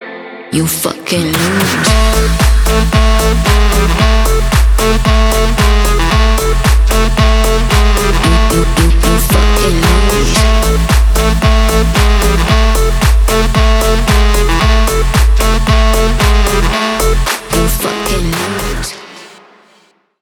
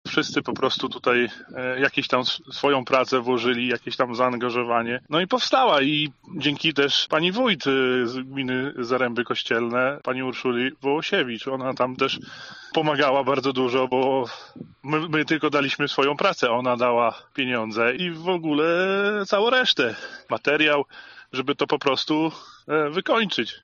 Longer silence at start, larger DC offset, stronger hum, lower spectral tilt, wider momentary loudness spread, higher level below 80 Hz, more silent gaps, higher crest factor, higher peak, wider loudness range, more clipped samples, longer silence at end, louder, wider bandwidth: about the same, 0 s vs 0.05 s; neither; neither; first, -4.5 dB/octave vs -2 dB/octave; second, 4 LU vs 8 LU; first, -12 dBFS vs -68 dBFS; neither; second, 10 dB vs 18 dB; first, 0 dBFS vs -4 dBFS; about the same, 2 LU vs 3 LU; neither; first, 0.95 s vs 0.05 s; first, -11 LUFS vs -23 LUFS; first, 19 kHz vs 7.4 kHz